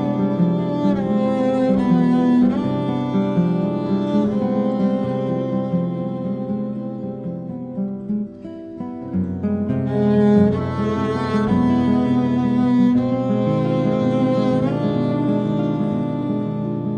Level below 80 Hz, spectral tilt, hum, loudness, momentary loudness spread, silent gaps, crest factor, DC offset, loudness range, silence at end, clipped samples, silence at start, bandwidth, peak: -50 dBFS; -9.5 dB/octave; none; -20 LUFS; 10 LU; none; 16 dB; under 0.1%; 7 LU; 0 s; under 0.1%; 0 s; 7.2 kHz; -2 dBFS